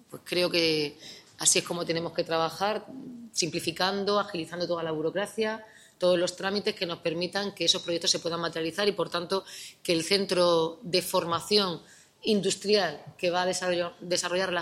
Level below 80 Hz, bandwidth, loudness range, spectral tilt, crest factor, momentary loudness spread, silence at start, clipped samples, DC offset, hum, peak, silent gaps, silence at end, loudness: -70 dBFS; 16 kHz; 3 LU; -3 dB/octave; 20 dB; 8 LU; 0.1 s; under 0.1%; under 0.1%; none; -8 dBFS; none; 0 s; -28 LUFS